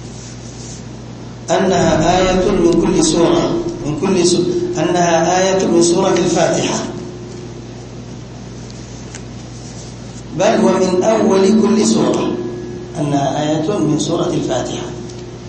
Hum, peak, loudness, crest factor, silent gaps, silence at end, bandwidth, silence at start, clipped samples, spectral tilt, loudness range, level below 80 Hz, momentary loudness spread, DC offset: none; 0 dBFS; -14 LUFS; 16 dB; none; 0 s; 8.8 kHz; 0 s; under 0.1%; -5 dB/octave; 8 LU; -38 dBFS; 18 LU; under 0.1%